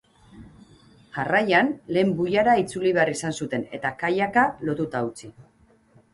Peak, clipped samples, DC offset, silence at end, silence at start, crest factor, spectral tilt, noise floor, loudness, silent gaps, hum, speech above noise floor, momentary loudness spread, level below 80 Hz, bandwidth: -6 dBFS; under 0.1%; under 0.1%; 0.7 s; 0.35 s; 18 dB; -5.5 dB/octave; -57 dBFS; -23 LUFS; none; none; 34 dB; 10 LU; -58 dBFS; 11.5 kHz